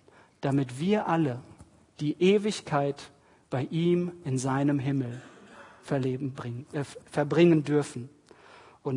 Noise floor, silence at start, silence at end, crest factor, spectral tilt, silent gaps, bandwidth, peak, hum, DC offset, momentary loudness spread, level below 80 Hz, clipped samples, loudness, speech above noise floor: -54 dBFS; 0.4 s; 0 s; 18 dB; -7 dB/octave; none; 11 kHz; -10 dBFS; none; under 0.1%; 15 LU; -68 dBFS; under 0.1%; -28 LUFS; 27 dB